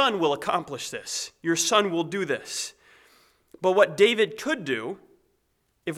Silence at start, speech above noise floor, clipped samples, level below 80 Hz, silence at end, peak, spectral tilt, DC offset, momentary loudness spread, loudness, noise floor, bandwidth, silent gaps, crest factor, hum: 0 s; 47 dB; under 0.1%; -72 dBFS; 0 s; -6 dBFS; -3 dB/octave; under 0.1%; 13 LU; -25 LUFS; -72 dBFS; 15.5 kHz; none; 20 dB; none